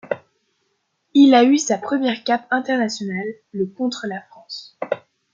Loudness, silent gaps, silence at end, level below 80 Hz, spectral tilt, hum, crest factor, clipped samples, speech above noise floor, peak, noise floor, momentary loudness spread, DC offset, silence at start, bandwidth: -19 LUFS; none; 0.35 s; -72 dBFS; -4 dB/octave; none; 18 dB; under 0.1%; 52 dB; -2 dBFS; -70 dBFS; 18 LU; under 0.1%; 0.05 s; 7.6 kHz